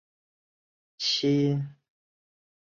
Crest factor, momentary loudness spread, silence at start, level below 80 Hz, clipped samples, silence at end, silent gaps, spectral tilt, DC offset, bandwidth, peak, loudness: 16 dB; 9 LU; 1 s; -74 dBFS; under 0.1%; 0.9 s; none; -5.5 dB/octave; under 0.1%; 7.4 kHz; -16 dBFS; -26 LUFS